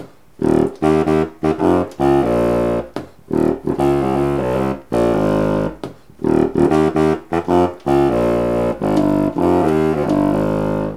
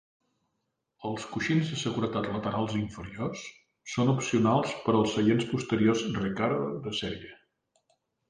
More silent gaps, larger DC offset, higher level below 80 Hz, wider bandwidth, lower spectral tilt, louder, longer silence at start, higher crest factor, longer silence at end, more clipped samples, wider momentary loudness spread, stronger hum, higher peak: neither; first, 0.5% vs under 0.1%; first, -36 dBFS vs -58 dBFS; first, 14.5 kHz vs 10 kHz; first, -8 dB/octave vs -6 dB/octave; first, -17 LUFS vs -29 LUFS; second, 0 s vs 1 s; about the same, 14 dB vs 18 dB; second, 0 s vs 0.95 s; neither; second, 6 LU vs 12 LU; neither; first, -2 dBFS vs -12 dBFS